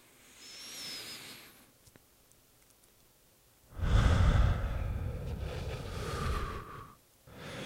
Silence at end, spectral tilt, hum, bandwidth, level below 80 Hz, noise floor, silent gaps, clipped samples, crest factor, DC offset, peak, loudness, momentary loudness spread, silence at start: 0 s; -5.5 dB/octave; none; 16 kHz; -38 dBFS; -65 dBFS; none; under 0.1%; 22 dB; under 0.1%; -14 dBFS; -35 LUFS; 24 LU; 0.35 s